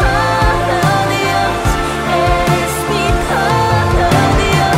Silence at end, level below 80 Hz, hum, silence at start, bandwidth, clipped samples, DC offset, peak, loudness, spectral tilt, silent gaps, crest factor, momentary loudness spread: 0 s; -22 dBFS; none; 0 s; 16 kHz; under 0.1%; under 0.1%; 0 dBFS; -13 LUFS; -5 dB/octave; none; 12 dB; 4 LU